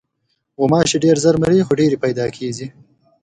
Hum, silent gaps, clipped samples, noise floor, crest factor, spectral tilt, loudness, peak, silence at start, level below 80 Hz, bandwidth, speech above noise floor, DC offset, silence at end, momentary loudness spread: none; none; under 0.1%; -70 dBFS; 16 dB; -5.5 dB/octave; -16 LUFS; 0 dBFS; 0.6 s; -48 dBFS; 11 kHz; 54 dB; under 0.1%; 0.55 s; 12 LU